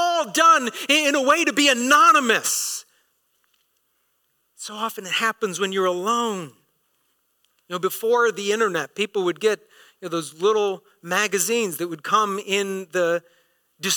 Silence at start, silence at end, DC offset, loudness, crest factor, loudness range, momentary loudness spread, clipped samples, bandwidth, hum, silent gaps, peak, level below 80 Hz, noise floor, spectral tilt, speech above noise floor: 0 s; 0 s; under 0.1%; -20 LUFS; 16 dB; 7 LU; 14 LU; under 0.1%; 19 kHz; none; none; -6 dBFS; -72 dBFS; -70 dBFS; -2 dB/octave; 48 dB